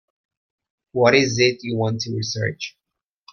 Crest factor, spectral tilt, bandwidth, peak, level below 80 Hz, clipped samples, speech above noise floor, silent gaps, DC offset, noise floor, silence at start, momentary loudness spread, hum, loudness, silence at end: 20 dB; -4.5 dB/octave; 7 kHz; -2 dBFS; -60 dBFS; under 0.1%; 36 dB; none; under 0.1%; -56 dBFS; 0.95 s; 14 LU; none; -20 LUFS; 0.65 s